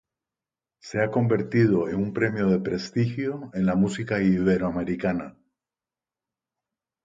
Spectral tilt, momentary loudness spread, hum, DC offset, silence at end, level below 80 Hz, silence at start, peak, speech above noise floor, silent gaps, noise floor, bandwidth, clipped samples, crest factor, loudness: -7.5 dB/octave; 8 LU; none; under 0.1%; 1.75 s; -54 dBFS; 0.85 s; -8 dBFS; over 66 dB; none; under -90 dBFS; 7.8 kHz; under 0.1%; 18 dB; -25 LUFS